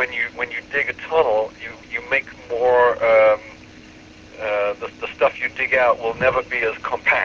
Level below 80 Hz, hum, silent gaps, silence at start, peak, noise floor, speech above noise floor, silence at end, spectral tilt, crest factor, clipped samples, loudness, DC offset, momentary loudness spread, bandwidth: -52 dBFS; none; none; 0 s; -4 dBFS; -43 dBFS; 24 dB; 0 s; -4.5 dB/octave; 16 dB; under 0.1%; -20 LUFS; under 0.1%; 14 LU; 7.2 kHz